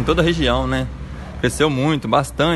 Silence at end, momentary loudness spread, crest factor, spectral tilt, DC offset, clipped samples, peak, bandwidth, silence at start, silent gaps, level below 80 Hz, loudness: 0 s; 11 LU; 18 dB; -5.5 dB/octave; under 0.1%; under 0.1%; 0 dBFS; 12.5 kHz; 0 s; none; -30 dBFS; -19 LUFS